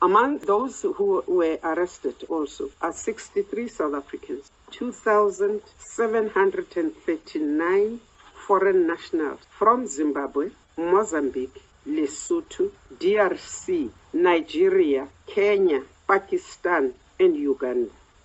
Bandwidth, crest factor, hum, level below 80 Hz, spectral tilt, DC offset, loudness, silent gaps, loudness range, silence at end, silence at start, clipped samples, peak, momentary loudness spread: 8.4 kHz; 18 dB; none; -60 dBFS; -4.5 dB/octave; under 0.1%; -24 LUFS; none; 4 LU; 0.35 s; 0 s; under 0.1%; -6 dBFS; 12 LU